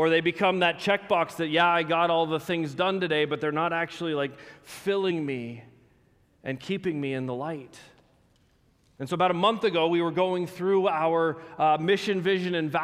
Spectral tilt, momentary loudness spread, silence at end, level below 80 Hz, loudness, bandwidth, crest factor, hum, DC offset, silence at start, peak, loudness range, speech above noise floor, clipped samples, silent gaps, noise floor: -6 dB/octave; 11 LU; 0 s; -68 dBFS; -26 LUFS; 15.5 kHz; 18 dB; none; under 0.1%; 0 s; -8 dBFS; 9 LU; 38 dB; under 0.1%; none; -64 dBFS